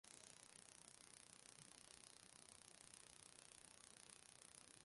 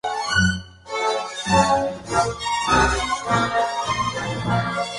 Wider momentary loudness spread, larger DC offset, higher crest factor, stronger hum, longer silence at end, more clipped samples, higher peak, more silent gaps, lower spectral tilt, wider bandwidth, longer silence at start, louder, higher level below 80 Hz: second, 1 LU vs 7 LU; neither; first, 28 dB vs 18 dB; neither; about the same, 0 s vs 0 s; neither; second, -38 dBFS vs -4 dBFS; neither; second, -1 dB/octave vs -4 dB/octave; about the same, 11.5 kHz vs 11.5 kHz; about the same, 0.05 s vs 0.05 s; second, -63 LUFS vs -21 LUFS; second, -88 dBFS vs -38 dBFS